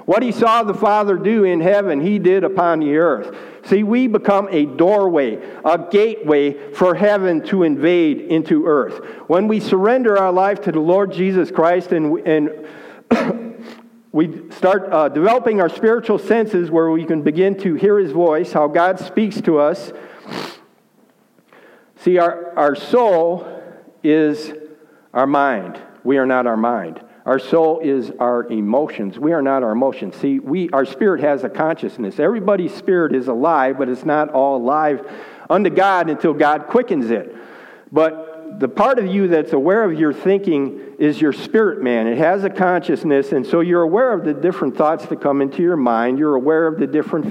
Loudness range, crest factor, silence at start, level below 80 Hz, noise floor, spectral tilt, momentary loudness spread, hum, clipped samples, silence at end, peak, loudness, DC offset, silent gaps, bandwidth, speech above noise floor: 3 LU; 16 dB; 0 s; -68 dBFS; -55 dBFS; -7.5 dB/octave; 8 LU; none; under 0.1%; 0 s; -2 dBFS; -17 LUFS; under 0.1%; none; 10.5 kHz; 39 dB